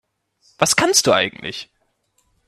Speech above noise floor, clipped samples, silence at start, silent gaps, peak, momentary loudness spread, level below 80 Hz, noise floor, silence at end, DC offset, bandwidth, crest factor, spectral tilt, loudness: 48 dB; under 0.1%; 0.6 s; none; 0 dBFS; 16 LU; -58 dBFS; -66 dBFS; 0.85 s; under 0.1%; 15 kHz; 22 dB; -2 dB/octave; -16 LUFS